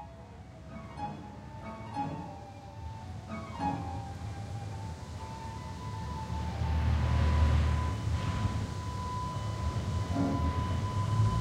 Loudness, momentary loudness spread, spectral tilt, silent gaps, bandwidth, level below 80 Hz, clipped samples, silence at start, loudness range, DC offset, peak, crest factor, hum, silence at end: -34 LUFS; 16 LU; -7 dB/octave; none; 10.5 kHz; -38 dBFS; under 0.1%; 0 s; 9 LU; under 0.1%; -16 dBFS; 18 dB; none; 0 s